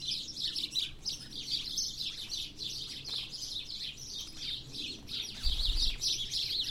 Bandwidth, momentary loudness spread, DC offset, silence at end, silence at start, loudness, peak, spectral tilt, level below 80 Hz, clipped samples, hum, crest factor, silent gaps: 16 kHz; 8 LU; under 0.1%; 0 s; 0 s; -35 LUFS; -16 dBFS; -0.5 dB/octave; -42 dBFS; under 0.1%; none; 20 dB; none